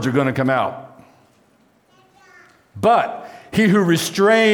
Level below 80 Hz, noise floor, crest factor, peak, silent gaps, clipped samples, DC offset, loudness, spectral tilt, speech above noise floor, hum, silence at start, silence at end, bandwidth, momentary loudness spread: -58 dBFS; -57 dBFS; 14 dB; -4 dBFS; none; under 0.1%; under 0.1%; -17 LUFS; -5.5 dB/octave; 41 dB; none; 0 s; 0 s; 20 kHz; 11 LU